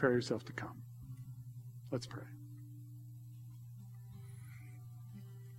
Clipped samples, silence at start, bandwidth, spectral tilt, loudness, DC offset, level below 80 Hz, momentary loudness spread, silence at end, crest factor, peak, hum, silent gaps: under 0.1%; 0 s; 16.5 kHz; -6.5 dB/octave; -46 LUFS; under 0.1%; -72 dBFS; 12 LU; 0 s; 26 dB; -18 dBFS; none; none